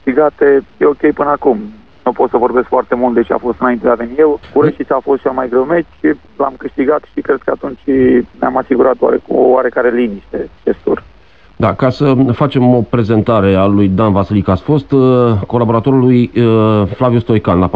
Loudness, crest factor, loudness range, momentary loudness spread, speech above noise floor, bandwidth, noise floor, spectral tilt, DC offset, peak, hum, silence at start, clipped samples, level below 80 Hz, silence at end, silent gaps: -12 LUFS; 12 dB; 3 LU; 7 LU; 33 dB; 5.4 kHz; -44 dBFS; -10 dB/octave; 0.6%; 0 dBFS; none; 0.05 s; under 0.1%; -40 dBFS; 0 s; none